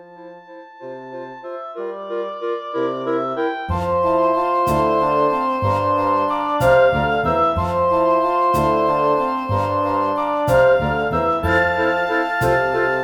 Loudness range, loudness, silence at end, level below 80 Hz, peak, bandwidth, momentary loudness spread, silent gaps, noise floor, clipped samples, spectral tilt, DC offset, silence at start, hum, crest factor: 7 LU; -18 LUFS; 0 s; -40 dBFS; -4 dBFS; 19 kHz; 13 LU; none; -40 dBFS; under 0.1%; -6.5 dB/octave; under 0.1%; 0 s; none; 16 dB